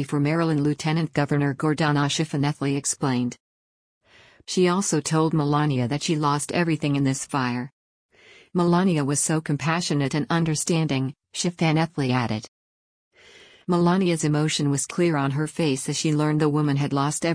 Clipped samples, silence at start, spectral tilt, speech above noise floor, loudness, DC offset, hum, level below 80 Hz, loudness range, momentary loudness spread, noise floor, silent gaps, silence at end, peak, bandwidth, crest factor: under 0.1%; 0 s; -5 dB/octave; 28 dB; -23 LUFS; under 0.1%; none; -60 dBFS; 2 LU; 5 LU; -51 dBFS; 3.40-4.01 s, 7.73-8.09 s, 12.48-13.11 s; 0 s; -10 dBFS; 10.5 kHz; 14 dB